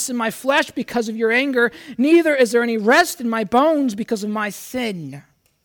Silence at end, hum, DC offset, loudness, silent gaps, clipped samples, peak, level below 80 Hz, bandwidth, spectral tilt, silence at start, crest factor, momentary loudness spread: 0.45 s; none; under 0.1%; -18 LUFS; none; under 0.1%; -6 dBFS; -60 dBFS; 19.5 kHz; -4 dB/octave; 0 s; 14 dB; 10 LU